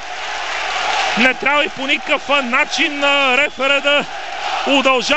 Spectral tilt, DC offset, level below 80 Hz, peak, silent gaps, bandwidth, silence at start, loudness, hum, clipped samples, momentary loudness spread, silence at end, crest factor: -2 dB/octave; 2%; -50 dBFS; -2 dBFS; none; 8.8 kHz; 0 s; -15 LUFS; none; under 0.1%; 9 LU; 0 s; 16 dB